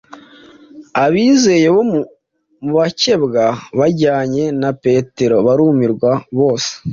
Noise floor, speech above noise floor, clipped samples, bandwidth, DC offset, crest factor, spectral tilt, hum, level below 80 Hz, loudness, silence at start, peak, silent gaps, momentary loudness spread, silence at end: -42 dBFS; 28 dB; under 0.1%; 7.6 kHz; under 0.1%; 12 dB; -5.5 dB/octave; none; -52 dBFS; -14 LUFS; 0.1 s; -2 dBFS; none; 7 LU; 0 s